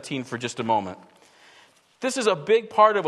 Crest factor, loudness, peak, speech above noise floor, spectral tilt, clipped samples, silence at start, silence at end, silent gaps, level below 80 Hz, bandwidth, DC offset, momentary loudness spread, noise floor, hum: 20 dB; -24 LUFS; -4 dBFS; 33 dB; -4 dB/octave; under 0.1%; 0.05 s; 0 s; none; -74 dBFS; 12.5 kHz; under 0.1%; 13 LU; -56 dBFS; none